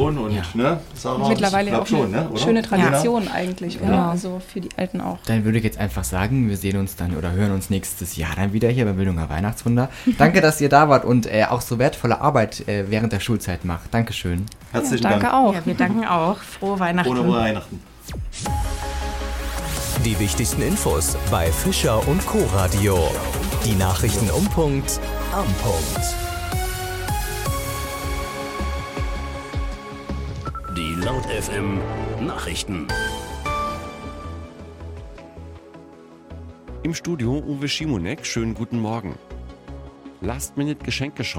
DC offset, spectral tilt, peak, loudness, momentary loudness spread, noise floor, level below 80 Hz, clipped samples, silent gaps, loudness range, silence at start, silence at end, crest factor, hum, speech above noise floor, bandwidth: under 0.1%; -5 dB/octave; 0 dBFS; -22 LUFS; 13 LU; -44 dBFS; -32 dBFS; under 0.1%; none; 10 LU; 0 s; 0 s; 20 dB; none; 23 dB; 17 kHz